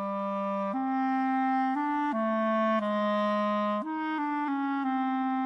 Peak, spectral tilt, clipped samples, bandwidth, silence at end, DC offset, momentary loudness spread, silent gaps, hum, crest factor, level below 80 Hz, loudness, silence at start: -18 dBFS; -7.5 dB/octave; under 0.1%; 6.4 kHz; 0 s; under 0.1%; 4 LU; none; none; 10 dB; -72 dBFS; -29 LUFS; 0 s